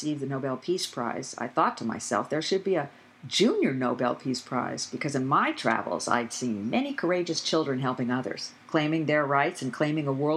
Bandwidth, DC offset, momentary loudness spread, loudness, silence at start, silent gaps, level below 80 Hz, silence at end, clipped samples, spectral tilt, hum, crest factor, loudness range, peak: 13.5 kHz; under 0.1%; 7 LU; -28 LUFS; 0 s; none; -80 dBFS; 0 s; under 0.1%; -4.5 dB/octave; none; 20 dB; 1 LU; -8 dBFS